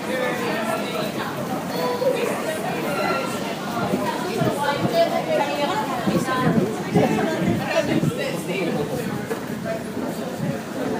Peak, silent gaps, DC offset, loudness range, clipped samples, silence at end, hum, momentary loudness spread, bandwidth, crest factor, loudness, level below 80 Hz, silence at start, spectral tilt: -6 dBFS; none; under 0.1%; 3 LU; under 0.1%; 0 s; none; 7 LU; 15.5 kHz; 18 dB; -23 LUFS; -54 dBFS; 0 s; -5.5 dB/octave